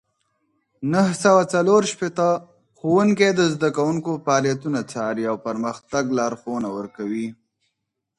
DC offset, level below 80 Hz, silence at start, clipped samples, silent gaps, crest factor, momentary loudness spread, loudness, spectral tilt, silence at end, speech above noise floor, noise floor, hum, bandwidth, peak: under 0.1%; -64 dBFS; 0.8 s; under 0.1%; none; 18 dB; 11 LU; -21 LUFS; -5.5 dB/octave; 0.85 s; 58 dB; -79 dBFS; none; 11.5 kHz; -4 dBFS